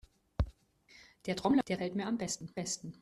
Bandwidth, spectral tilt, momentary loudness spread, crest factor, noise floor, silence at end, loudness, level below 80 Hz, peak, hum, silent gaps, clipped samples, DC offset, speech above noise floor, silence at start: 13 kHz; -5 dB/octave; 9 LU; 18 dB; -63 dBFS; 0.1 s; -36 LUFS; -48 dBFS; -18 dBFS; none; none; under 0.1%; under 0.1%; 29 dB; 0.4 s